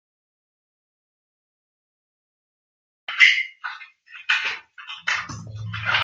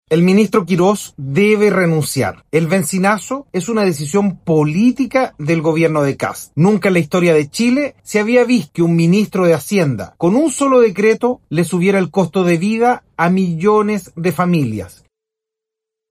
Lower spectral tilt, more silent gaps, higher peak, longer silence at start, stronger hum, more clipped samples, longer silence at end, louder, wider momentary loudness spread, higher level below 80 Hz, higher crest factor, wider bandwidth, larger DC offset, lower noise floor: second, -1.5 dB/octave vs -6 dB/octave; neither; about the same, -2 dBFS vs -2 dBFS; first, 3.1 s vs 0.1 s; neither; neither; second, 0 s vs 1.2 s; second, -20 LUFS vs -15 LUFS; first, 23 LU vs 7 LU; second, -62 dBFS vs -54 dBFS; first, 26 dB vs 14 dB; second, 9 kHz vs 16 kHz; neither; second, -44 dBFS vs -83 dBFS